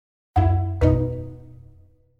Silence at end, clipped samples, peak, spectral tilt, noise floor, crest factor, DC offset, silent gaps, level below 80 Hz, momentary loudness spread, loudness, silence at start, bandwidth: 0.8 s; under 0.1%; -4 dBFS; -10 dB/octave; -52 dBFS; 20 dB; under 0.1%; none; -32 dBFS; 17 LU; -22 LUFS; 0.35 s; 4.7 kHz